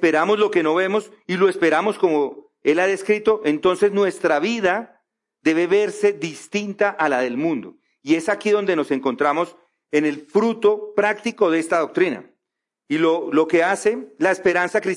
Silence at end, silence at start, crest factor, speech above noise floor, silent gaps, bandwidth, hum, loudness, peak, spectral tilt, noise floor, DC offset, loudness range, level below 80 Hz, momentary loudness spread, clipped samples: 0 s; 0 s; 14 dB; 64 dB; none; 11.5 kHz; none; -20 LUFS; -6 dBFS; -5 dB/octave; -83 dBFS; under 0.1%; 2 LU; -68 dBFS; 7 LU; under 0.1%